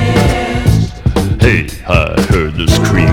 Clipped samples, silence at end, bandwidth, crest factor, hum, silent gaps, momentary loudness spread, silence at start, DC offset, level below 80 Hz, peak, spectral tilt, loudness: 0.4%; 0 s; 16.5 kHz; 10 dB; none; none; 4 LU; 0 s; under 0.1%; -20 dBFS; 0 dBFS; -6 dB/octave; -12 LUFS